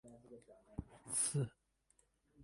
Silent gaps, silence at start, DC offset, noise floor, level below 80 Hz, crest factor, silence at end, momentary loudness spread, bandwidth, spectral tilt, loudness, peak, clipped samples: none; 0.05 s; under 0.1%; -77 dBFS; -64 dBFS; 22 dB; 0 s; 24 LU; 11.5 kHz; -4 dB/octave; -39 LUFS; -24 dBFS; under 0.1%